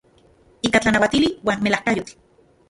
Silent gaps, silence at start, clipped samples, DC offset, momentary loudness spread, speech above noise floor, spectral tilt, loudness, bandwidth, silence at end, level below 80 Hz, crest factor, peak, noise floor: none; 0.65 s; under 0.1%; under 0.1%; 9 LU; 35 dB; -4.5 dB/octave; -19 LUFS; 11.5 kHz; 0.6 s; -48 dBFS; 20 dB; -2 dBFS; -55 dBFS